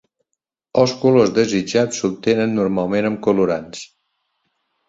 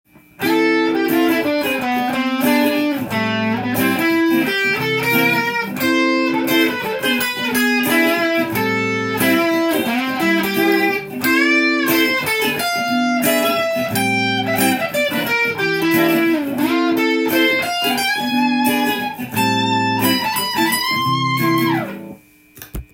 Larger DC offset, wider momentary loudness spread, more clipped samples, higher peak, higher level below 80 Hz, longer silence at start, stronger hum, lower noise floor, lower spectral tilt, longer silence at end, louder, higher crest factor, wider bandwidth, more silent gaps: neither; first, 8 LU vs 4 LU; neither; about the same, -2 dBFS vs -2 dBFS; second, -56 dBFS vs -50 dBFS; first, 0.75 s vs 0.4 s; neither; first, -79 dBFS vs -42 dBFS; first, -5.5 dB/octave vs -4 dB/octave; first, 1.05 s vs 0.1 s; about the same, -18 LUFS vs -17 LUFS; about the same, 18 dB vs 14 dB; second, 8 kHz vs 17 kHz; neither